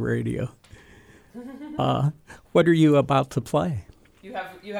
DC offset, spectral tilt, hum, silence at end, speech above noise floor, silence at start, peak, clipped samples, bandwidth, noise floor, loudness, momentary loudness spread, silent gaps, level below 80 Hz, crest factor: under 0.1%; -7.5 dB/octave; none; 0 s; 29 dB; 0 s; -6 dBFS; under 0.1%; 15.5 kHz; -51 dBFS; -23 LUFS; 18 LU; none; -52 dBFS; 18 dB